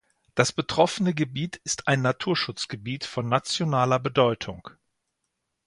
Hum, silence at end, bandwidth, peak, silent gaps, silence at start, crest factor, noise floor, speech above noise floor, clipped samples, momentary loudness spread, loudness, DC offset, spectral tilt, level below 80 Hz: none; 0.95 s; 11.5 kHz; -2 dBFS; none; 0.35 s; 24 dB; -80 dBFS; 54 dB; under 0.1%; 10 LU; -25 LUFS; under 0.1%; -4.5 dB/octave; -60 dBFS